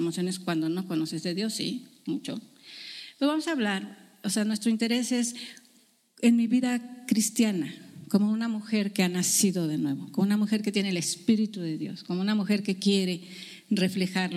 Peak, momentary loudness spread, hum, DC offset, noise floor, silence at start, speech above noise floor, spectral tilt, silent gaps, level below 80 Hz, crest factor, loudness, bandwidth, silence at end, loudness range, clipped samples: -10 dBFS; 13 LU; none; under 0.1%; -63 dBFS; 0 s; 36 dB; -4.5 dB/octave; none; -78 dBFS; 18 dB; -27 LUFS; 15.5 kHz; 0 s; 5 LU; under 0.1%